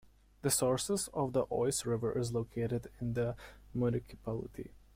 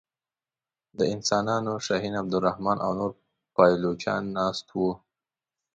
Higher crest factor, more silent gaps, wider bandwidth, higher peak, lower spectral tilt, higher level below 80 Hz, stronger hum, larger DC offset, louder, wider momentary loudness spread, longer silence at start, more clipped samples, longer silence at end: about the same, 18 dB vs 22 dB; neither; first, 16.5 kHz vs 9.2 kHz; second, -18 dBFS vs -6 dBFS; about the same, -5 dB/octave vs -5 dB/octave; about the same, -58 dBFS vs -60 dBFS; neither; neither; second, -35 LUFS vs -26 LUFS; about the same, 10 LU vs 10 LU; second, 0.45 s vs 1 s; neither; second, 0.15 s vs 0.8 s